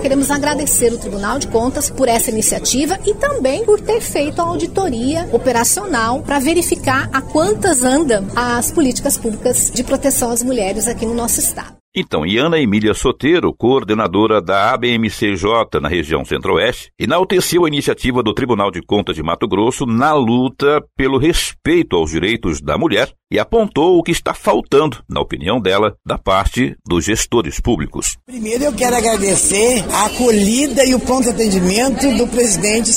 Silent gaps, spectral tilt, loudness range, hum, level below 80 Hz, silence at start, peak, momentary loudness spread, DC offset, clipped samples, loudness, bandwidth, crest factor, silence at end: 11.80-11.92 s; -3.5 dB/octave; 2 LU; none; -32 dBFS; 0 s; -2 dBFS; 5 LU; under 0.1%; under 0.1%; -15 LUFS; 16.5 kHz; 14 dB; 0 s